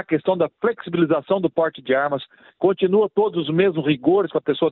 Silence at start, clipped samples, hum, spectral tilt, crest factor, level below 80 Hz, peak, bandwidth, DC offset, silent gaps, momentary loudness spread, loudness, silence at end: 0.1 s; under 0.1%; none; -11 dB/octave; 16 dB; -64 dBFS; -4 dBFS; 4.2 kHz; under 0.1%; none; 4 LU; -20 LUFS; 0 s